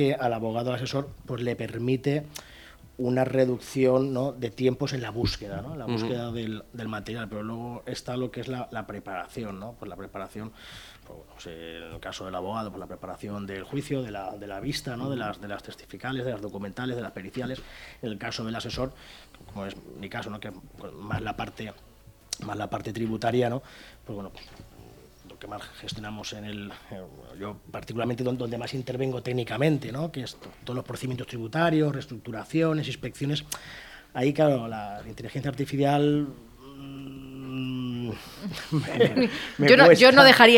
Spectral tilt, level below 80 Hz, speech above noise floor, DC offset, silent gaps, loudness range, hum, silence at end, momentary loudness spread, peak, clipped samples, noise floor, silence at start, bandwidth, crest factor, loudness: -5.5 dB/octave; -54 dBFS; 24 dB; under 0.1%; none; 11 LU; none; 0 s; 17 LU; 0 dBFS; under 0.1%; -50 dBFS; 0 s; 19.5 kHz; 26 dB; -26 LUFS